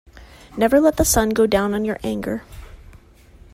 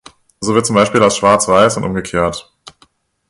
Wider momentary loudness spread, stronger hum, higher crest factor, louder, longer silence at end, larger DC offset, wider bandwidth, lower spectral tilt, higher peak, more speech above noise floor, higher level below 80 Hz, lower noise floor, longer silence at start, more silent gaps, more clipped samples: first, 13 LU vs 9 LU; neither; about the same, 16 dB vs 14 dB; second, -19 LUFS vs -13 LUFS; about the same, 0.8 s vs 0.9 s; neither; first, 16 kHz vs 12 kHz; about the same, -4.5 dB/octave vs -4 dB/octave; second, -4 dBFS vs 0 dBFS; second, 29 dB vs 41 dB; first, -36 dBFS vs -42 dBFS; second, -47 dBFS vs -54 dBFS; second, 0.15 s vs 0.4 s; neither; neither